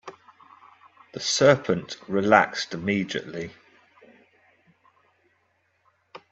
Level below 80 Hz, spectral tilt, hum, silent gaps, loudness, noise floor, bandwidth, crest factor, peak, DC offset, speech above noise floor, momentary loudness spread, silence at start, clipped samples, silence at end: -66 dBFS; -4 dB/octave; none; none; -23 LUFS; -69 dBFS; 8.2 kHz; 26 dB; 0 dBFS; under 0.1%; 46 dB; 18 LU; 0.05 s; under 0.1%; 0.15 s